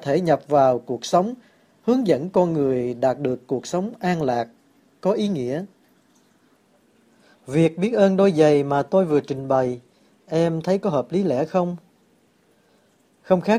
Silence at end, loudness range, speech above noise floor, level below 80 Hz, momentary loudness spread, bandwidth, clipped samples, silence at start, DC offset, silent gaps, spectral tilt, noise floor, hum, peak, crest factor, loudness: 0 s; 6 LU; 40 dB; -62 dBFS; 10 LU; 12 kHz; under 0.1%; 0 s; under 0.1%; none; -7 dB/octave; -60 dBFS; none; -4 dBFS; 18 dB; -21 LUFS